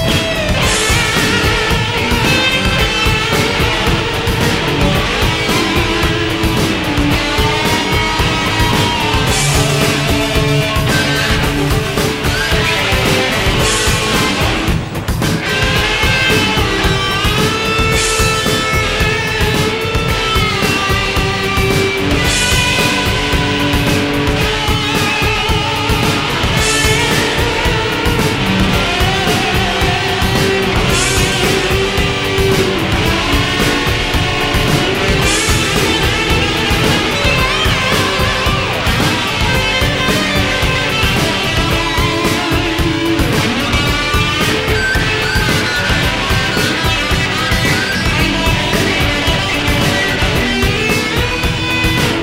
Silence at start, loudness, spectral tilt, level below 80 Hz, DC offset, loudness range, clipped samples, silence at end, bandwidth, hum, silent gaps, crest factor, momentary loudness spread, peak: 0 s; -13 LUFS; -4 dB/octave; -24 dBFS; 0.2%; 1 LU; under 0.1%; 0 s; 16.5 kHz; none; none; 14 dB; 2 LU; 0 dBFS